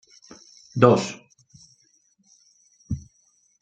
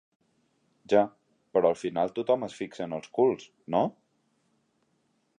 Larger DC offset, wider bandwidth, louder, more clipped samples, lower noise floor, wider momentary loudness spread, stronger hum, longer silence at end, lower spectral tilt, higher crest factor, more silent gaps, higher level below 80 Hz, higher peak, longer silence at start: neither; second, 9 kHz vs 10 kHz; first, -22 LUFS vs -28 LUFS; neither; second, -64 dBFS vs -73 dBFS; first, 24 LU vs 10 LU; neither; second, 0.6 s vs 1.5 s; about the same, -6.5 dB/octave vs -6.5 dB/octave; about the same, 24 dB vs 22 dB; neither; first, -54 dBFS vs -72 dBFS; first, -2 dBFS vs -8 dBFS; second, 0.75 s vs 0.9 s